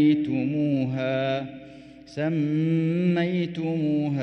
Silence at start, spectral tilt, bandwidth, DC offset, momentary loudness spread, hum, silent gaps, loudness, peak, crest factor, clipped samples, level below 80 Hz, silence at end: 0 s; -9 dB/octave; 6.2 kHz; under 0.1%; 10 LU; none; none; -25 LUFS; -10 dBFS; 14 dB; under 0.1%; -64 dBFS; 0 s